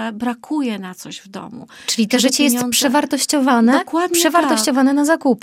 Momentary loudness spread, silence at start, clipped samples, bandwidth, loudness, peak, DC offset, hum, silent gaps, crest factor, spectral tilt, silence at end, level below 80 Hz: 17 LU; 0 s; under 0.1%; 16.5 kHz; -16 LUFS; -2 dBFS; under 0.1%; none; none; 16 dB; -2.5 dB/octave; 0.05 s; -64 dBFS